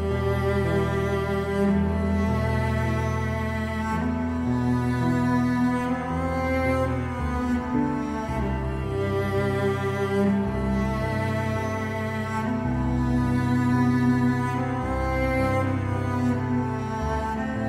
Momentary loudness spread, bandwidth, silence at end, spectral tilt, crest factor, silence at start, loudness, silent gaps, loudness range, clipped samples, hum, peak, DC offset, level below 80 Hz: 5 LU; 14.5 kHz; 0 s; -7.5 dB/octave; 14 dB; 0 s; -25 LUFS; none; 2 LU; under 0.1%; none; -10 dBFS; under 0.1%; -36 dBFS